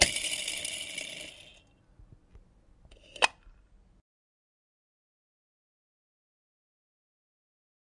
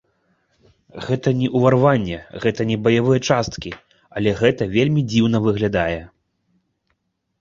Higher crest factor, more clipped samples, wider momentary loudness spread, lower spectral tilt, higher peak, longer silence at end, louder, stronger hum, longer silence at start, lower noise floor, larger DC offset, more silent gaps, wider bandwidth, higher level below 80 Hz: first, 38 dB vs 18 dB; neither; first, 23 LU vs 14 LU; second, 0 dB/octave vs -6.5 dB/octave; about the same, 0 dBFS vs -2 dBFS; first, 4.45 s vs 1.35 s; second, -31 LUFS vs -19 LUFS; neither; second, 0 s vs 0.95 s; second, -60 dBFS vs -71 dBFS; neither; neither; first, 11.5 kHz vs 7.6 kHz; second, -58 dBFS vs -46 dBFS